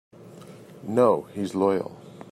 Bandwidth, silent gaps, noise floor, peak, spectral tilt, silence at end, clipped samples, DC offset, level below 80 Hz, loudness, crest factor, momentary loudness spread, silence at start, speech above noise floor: 13.5 kHz; none; -45 dBFS; -8 dBFS; -7.5 dB/octave; 0.05 s; under 0.1%; under 0.1%; -72 dBFS; -24 LUFS; 18 dB; 24 LU; 0.2 s; 22 dB